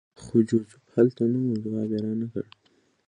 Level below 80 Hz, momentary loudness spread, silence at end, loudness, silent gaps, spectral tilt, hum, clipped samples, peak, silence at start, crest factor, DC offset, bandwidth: -64 dBFS; 10 LU; 0.65 s; -26 LUFS; none; -9 dB/octave; none; under 0.1%; -8 dBFS; 0.2 s; 20 dB; under 0.1%; 10 kHz